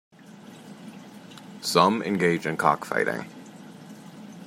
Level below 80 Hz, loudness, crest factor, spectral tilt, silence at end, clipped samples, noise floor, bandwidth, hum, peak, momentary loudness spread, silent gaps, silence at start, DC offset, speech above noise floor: -70 dBFS; -24 LUFS; 24 dB; -4.5 dB/octave; 0 s; under 0.1%; -46 dBFS; 16 kHz; none; -4 dBFS; 24 LU; none; 0.3 s; under 0.1%; 23 dB